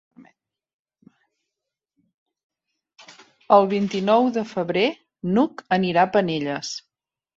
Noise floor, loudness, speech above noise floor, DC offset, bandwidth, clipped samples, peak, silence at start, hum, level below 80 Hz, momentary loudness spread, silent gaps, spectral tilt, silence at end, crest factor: -85 dBFS; -21 LUFS; 65 dB; under 0.1%; 7.8 kHz; under 0.1%; -2 dBFS; 0.2 s; none; -66 dBFS; 11 LU; 0.74-0.85 s, 2.14-2.26 s, 2.44-2.50 s; -6 dB/octave; 0.6 s; 22 dB